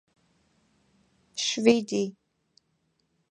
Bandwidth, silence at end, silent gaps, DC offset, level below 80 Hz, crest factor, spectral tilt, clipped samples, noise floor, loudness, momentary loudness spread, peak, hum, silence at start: 10.5 kHz; 1.2 s; none; under 0.1%; -76 dBFS; 24 dB; -3.5 dB/octave; under 0.1%; -74 dBFS; -26 LUFS; 12 LU; -6 dBFS; none; 1.35 s